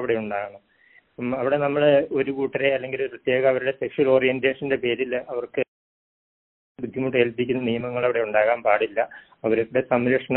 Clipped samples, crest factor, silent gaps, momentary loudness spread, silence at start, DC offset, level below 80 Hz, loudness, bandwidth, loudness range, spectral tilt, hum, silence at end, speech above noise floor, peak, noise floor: under 0.1%; 20 dB; 5.68-6.75 s; 10 LU; 0 s; under 0.1%; -62 dBFS; -23 LUFS; 4.1 kHz; 5 LU; -4 dB/octave; none; 0 s; 35 dB; -4 dBFS; -58 dBFS